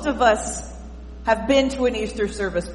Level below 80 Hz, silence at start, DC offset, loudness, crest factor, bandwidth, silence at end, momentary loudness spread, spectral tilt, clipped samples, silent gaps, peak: -36 dBFS; 0 s; under 0.1%; -22 LUFS; 18 dB; 11.5 kHz; 0 s; 17 LU; -4 dB/octave; under 0.1%; none; -4 dBFS